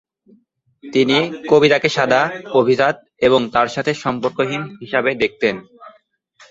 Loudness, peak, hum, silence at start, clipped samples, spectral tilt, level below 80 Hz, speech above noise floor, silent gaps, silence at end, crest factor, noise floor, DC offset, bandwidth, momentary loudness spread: -17 LUFS; -2 dBFS; none; 0.85 s; under 0.1%; -5 dB/octave; -56 dBFS; 40 dB; none; 0.6 s; 16 dB; -57 dBFS; under 0.1%; 7.8 kHz; 7 LU